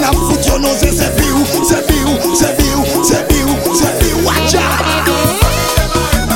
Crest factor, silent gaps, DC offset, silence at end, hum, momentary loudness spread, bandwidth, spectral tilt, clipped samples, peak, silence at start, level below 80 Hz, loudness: 12 dB; none; under 0.1%; 0 s; none; 1 LU; 17 kHz; -4 dB/octave; under 0.1%; 0 dBFS; 0 s; -20 dBFS; -12 LUFS